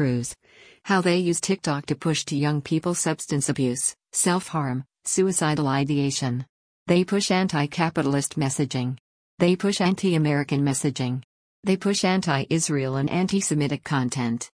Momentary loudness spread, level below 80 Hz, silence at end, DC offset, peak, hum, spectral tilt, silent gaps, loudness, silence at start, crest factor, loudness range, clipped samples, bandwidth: 7 LU; -60 dBFS; 0.15 s; under 0.1%; -6 dBFS; none; -4.5 dB/octave; 6.49-6.86 s, 9.00-9.38 s, 11.24-11.63 s; -24 LUFS; 0 s; 16 dB; 1 LU; under 0.1%; 10.5 kHz